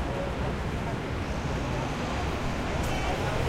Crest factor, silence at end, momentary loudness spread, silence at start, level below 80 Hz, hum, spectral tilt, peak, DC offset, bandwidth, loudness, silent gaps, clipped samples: 14 dB; 0 s; 3 LU; 0 s; -36 dBFS; none; -5.5 dB/octave; -14 dBFS; under 0.1%; 16 kHz; -31 LUFS; none; under 0.1%